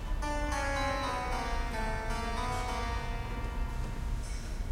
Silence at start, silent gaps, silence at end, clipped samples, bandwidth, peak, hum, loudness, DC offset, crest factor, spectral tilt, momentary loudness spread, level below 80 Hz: 0 s; none; 0 s; under 0.1%; 15.5 kHz; -20 dBFS; none; -35 LUFS; under 0.1%; 14 dB; -4.5 dB/octave; 7 LU; -36 dBFS